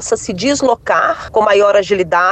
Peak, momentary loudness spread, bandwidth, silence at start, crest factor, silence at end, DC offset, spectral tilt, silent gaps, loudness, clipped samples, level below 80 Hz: -2 dBFS; 6 LU; 9.2 kHz; 0 s; 12 dB; 0 s; under 0.1%; -3.5 dB/octave; none; -13 LUFS; under 0.1%; -44 dBFS